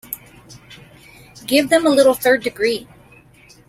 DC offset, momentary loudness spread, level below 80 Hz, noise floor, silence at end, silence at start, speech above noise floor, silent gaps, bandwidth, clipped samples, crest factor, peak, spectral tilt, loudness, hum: under 0.1%; 18 LU; -54 dBFS; -48 dBFS; 0.85 s; 0.1 s; 33 dB; none; 16.5 kHz; under 0.1%; 18 dB; -2 dBFS; -3 dB/octave; -16 LUFS; none